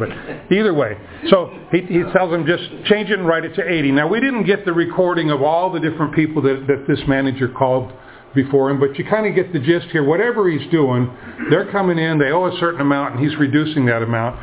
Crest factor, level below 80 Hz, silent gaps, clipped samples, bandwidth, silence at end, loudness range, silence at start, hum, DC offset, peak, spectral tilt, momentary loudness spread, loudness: 16 dB; -48 dBFS; none; under 0.1%; 4 kHz; 0 s; 1 LU; 0 s; none; under 0.1%; 0 dBFS; -10.5 dB/octave; 5 LU; -17 LUFS